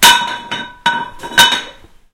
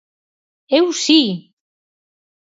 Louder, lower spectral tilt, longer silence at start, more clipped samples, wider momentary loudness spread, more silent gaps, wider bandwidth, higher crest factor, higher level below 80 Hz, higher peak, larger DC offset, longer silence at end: about the same, -13 LUFS vs -15 LUFS; second, 0.5 dB/octave vs -3.5 dB/octave; second, 0 s vs 0.7 s; first, 0.6% vs under 0.1%; first, 14 LU vs 9 LU; neither; first, over 20 kHz vs 8 kHz; about the same, 14 dB vs 18 dB; first, -44 dBFS vs -76 dBFS; about the same, 0 dBFS vs -2 dBFS; neither; second, 0.4 s vs 1.15 s